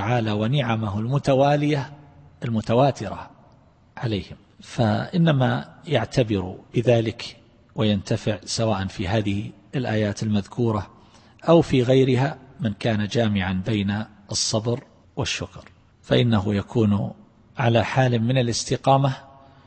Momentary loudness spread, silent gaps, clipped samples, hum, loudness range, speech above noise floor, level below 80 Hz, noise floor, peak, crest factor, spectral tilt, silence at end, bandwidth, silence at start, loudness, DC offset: 12 LU; none; under 0.1%; none; 4 LU; 32 dB; -50 dBFS; -54 dBFS; -4 dBFS; 20 dB; -6 dB/octave; 0.4 s; 8.8 kHz; 0 s; -23 LUFS; under 0.1%